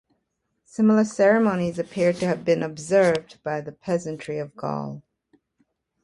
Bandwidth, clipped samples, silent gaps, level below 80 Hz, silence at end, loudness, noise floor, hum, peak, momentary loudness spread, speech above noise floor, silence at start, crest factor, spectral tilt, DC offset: 11.5 kHz; under 0.1%; none; -62 dBFS; 1.05 s; -23 LUFS; -76 dBFS; none; -8 dBFS; 13 LU; 53 dB; 0.75 s; 16 dB; -6.5 dB/octave; under 0.1%